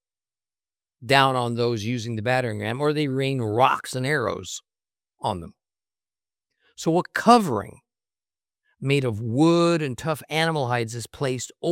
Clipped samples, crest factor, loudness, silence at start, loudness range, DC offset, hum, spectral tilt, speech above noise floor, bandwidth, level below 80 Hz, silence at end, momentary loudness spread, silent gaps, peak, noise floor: under 0.1%; 22 dB; -23 LUFS; 1 s; 4 LU; under 0.1%; none; -5.5 dB/octave; over 67 dB; 16.5 kHz; -64 dBFS; 0 s; 12 LU; none; -2 dBFS; under -90 dBFS